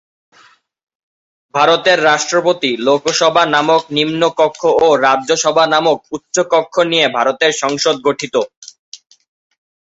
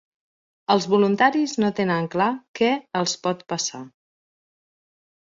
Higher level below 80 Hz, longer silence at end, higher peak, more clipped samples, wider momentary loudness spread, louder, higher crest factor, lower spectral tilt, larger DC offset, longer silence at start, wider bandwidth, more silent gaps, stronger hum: first, -60 dBFS vs -66 dBFS; second, 0.95 s vs 1.5 s; first, 0 dBFS vs -4 dBFS; neither; about the same, 7 LU vs 8 LU; first, -13 LUFS vs -22 LUFS; second, 14 dB vs 20 dB; second, -2.5 dB/octave vs -4.5 dB/octave; neither; first, 1.55 s vs 0.7 s; about the same, 8 kHz vs 7.8 kHz; first, 8.57-8.62 s, 8.79-8.92 s vs 2.48-2.54 s; neither